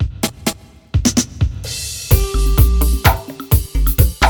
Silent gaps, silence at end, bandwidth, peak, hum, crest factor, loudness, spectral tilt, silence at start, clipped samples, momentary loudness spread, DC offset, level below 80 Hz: none; 0 s; 19.5 kHz; 0 dBFS; none; 16 dB; -17 LUFS; -4.5 dB/octave; 0 s; under 0.1%; 9 LU; under 0.1%; -18 dBFS